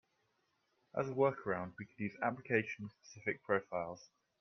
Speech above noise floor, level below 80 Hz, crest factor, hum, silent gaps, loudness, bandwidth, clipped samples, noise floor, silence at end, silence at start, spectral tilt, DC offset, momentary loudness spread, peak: 41 dB; -80 dBFS; 22 dB; none; none; -39 LUFS; 6.6 kHz; under 0.1%; -80 dBFS; 0.35 s; 0.95 s; -7 dB/octave; under 0.1%; 13 LU; -16 dBFS